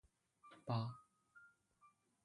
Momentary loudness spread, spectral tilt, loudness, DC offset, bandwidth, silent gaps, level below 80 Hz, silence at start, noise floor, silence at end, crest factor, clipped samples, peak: 23 LU; -8 dB/octave; -46 LUFS; under 0.1%; 11 kHz; none; -82 dBFS; 0.45 s; -75 dBFS; 0.4 s; 22 dB; under 0.1%; -28 dBFS